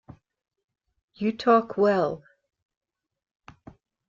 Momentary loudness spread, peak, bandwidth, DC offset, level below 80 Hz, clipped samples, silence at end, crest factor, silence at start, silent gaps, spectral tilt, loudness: 9 LU; -8 dBFS; 7.4 kHz; under 0.1%; -66 dBFS; under 0.1%; 1.9 s; 20 dB; 1.2 s; none; -7 dB/octave; -24 LUFS